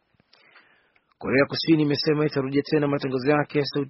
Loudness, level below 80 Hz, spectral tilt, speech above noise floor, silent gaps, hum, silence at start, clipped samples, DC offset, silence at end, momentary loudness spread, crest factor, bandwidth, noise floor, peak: -23 LUFS; -62 dBFS; -5 dB/octave; 41 dB; none; none; 1.2 s; under 0.1%; under 0.1%; 0 s; 4 LU; 18 dB; 6 kHz; -63 dBFS; -6 dBFS